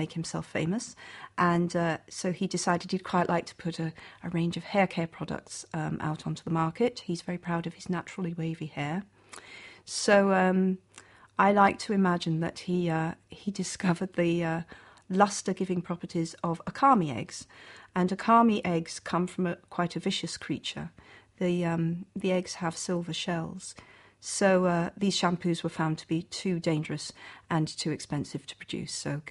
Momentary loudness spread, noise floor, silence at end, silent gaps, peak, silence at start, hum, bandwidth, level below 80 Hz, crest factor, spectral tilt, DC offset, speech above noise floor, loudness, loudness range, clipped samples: 14 LU; -55 dBFS; 0 s; none; -8 dBFS; 0 s; none; 11.5 kHz; -64 dBFS; 22 dB; -5.5 dB/octave; under 0.1%; 26 dB; -29 LUFS; 6 LU; under 0.1%